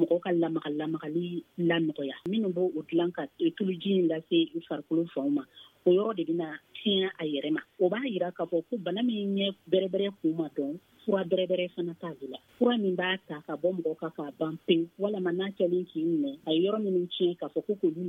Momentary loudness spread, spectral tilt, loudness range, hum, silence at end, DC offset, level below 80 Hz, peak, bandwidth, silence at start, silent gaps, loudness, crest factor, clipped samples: 8 LU; -8 dB/octave; 2 LU; none; 0 s; under 0.1%; -80 dBFS; -12 dBFS; 4 kHz; 0 s; none; -30 LUFS; 18 dB; under 0.1%